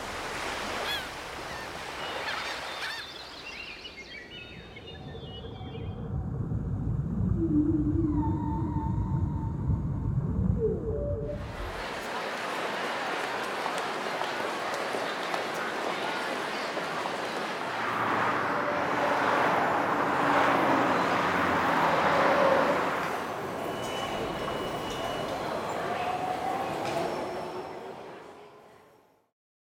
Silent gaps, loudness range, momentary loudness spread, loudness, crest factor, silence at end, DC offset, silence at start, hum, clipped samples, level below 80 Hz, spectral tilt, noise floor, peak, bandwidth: none; 11 LU; 15 LU; -30 LUFS; 20 dB; 1 s; under 0.1%; 0 s; none; under 0.1%; -44 dBFS; -5.5 dB/octave; -61 dBFS; -12 dBFS; 16 kHz